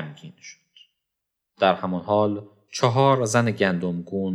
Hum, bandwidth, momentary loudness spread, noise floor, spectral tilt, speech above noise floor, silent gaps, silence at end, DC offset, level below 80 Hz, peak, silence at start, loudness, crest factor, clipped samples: none; 13 kHz; 16 LU; -82 dBFS; -5.5 dB/octave; 60 dB; none; 0 s; under 0.1%; -68 dBFS; -4 dBFS; 0 s; -22 LUFS; 20 dB; under 0.1%